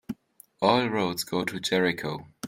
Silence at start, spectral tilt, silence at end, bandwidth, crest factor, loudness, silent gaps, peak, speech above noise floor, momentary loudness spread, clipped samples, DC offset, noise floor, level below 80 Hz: 0.1 s; -4.5 dB/octave; 0 s; 16.5 kHz; 22 dB; -26 LUFS; none; -6 dBFS; 29 dB; 12 LU; under 0.1%; under 0.1%; -55 dBFS; -64 dBFS